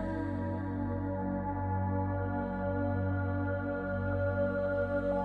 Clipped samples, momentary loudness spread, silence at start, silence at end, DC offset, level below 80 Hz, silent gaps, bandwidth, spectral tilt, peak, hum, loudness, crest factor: under 0.1%; 4 LU; 0 s; 0 s; under 0.1%; -48 dBFS; none; 4.3 kHz; -10.5 dB/octave; -20 dBFS; none; -34 LUFS; 12 dB